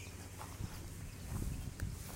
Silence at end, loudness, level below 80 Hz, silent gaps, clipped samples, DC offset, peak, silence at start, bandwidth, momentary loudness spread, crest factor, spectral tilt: 0 s; -46 LUFS; -48 dBFS; none; under 0.1%; under 0.1%; -28 dBFS; 0 s; 16 kHz; 6 LU; 18 dB; -5 dB/octave